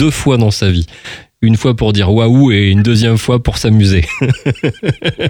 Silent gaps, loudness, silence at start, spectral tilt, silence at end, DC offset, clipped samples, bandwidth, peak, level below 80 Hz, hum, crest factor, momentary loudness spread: none; -11 LUFS; 0 s; -6.5 dB/octave; 0 s; under 0.1%; under 0.1%; 15.5 kHz; 0 dBFS; -30 dBFS; none; 10 dB; 7 LU